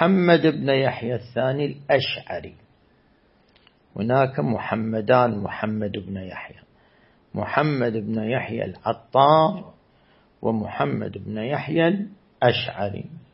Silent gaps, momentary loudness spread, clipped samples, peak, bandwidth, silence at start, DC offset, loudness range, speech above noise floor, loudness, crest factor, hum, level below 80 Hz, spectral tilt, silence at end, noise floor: none; 15 LU; under 0.1%; -2 dBFS; 5.8 kHz; 0 s; under 0.1%; 4 LU; 37 dB; -23 LUFS; 22 dB; none; -60 dBFS; -11 dB/octave; 0.15 s; -59 dBFS